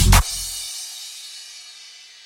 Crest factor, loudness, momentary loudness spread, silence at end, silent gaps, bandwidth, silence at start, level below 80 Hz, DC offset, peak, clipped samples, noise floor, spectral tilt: 22 dB; -23 LUFS; 22 LU; 0.35 s; none; 16.5 kHz; 0 s; -24 dBFS; under 0.1%; 0 dBFS; under 0.1%; -43 dBFS; -3 dB/octave